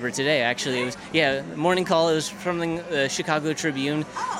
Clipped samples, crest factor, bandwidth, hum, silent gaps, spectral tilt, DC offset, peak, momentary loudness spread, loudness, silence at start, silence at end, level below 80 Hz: under 0.1%; 18 dB; 16 kHz; none; none; -4 dB/octave; under 0.1%; -6 dBFS; 6 LU; -24 LUFS; 0 s; 0 s; -60 dBFS